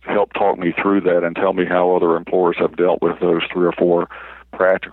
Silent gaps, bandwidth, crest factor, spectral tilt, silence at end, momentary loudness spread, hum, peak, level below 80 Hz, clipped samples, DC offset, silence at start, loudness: none; 4.1 kHz; 14 dB; -9.5 dB/octave; 0 s; 4 LU; none; -2 dBFS; -54 dBFS; under 0.1%; under 0.1%; 0.05 s; -17 LUFS